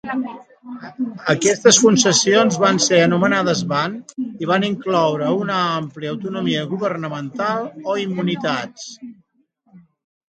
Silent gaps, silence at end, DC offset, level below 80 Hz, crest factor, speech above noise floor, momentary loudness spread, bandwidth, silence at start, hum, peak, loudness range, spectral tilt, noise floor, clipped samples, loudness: none; 0.5 s; under 0.1%; -64 dBFS; 18 dB; 44 dB; 16 LU; 9.6 kHz; 0.05 s; none; 0 dBFS; 9 LU; -3.5 dB/octave; -63 dBFS; under 0.1%; -18 LUFS